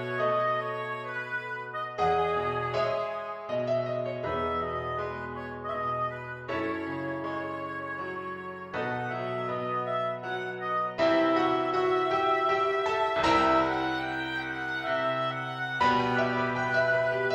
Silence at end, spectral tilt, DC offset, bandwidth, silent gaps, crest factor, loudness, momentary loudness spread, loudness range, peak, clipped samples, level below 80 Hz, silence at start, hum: 0 s; -6 dB/octave; under 0.1%; 11 kHz; none; 18 dB; -29 LUFS; 10 LU; 8 LU; -12 dBFS; under 0.1%; -58 dBFS; 0 s; none